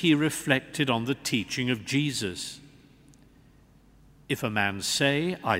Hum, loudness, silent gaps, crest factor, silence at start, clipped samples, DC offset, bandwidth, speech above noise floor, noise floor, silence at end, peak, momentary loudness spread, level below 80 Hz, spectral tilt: none; -27 LUFS; none; 24 dB; 0 s; under 0.1%; under 0.1%; 16 kHz; 30 dB; -57 dBFS; 0 s; -6 dBFS; 9 LU; -60 dBFS; -4 dB/octave